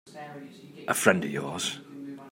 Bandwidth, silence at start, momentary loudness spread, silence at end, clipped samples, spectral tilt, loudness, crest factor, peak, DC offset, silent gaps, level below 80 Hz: 16 kHz; 0.05 s; 20 LU; 0 s; under 0.1%; -3.5 dB/octave; -27 LUFS; 28 dB; -4 dBFS; under 0.1%; none; -74 dBFS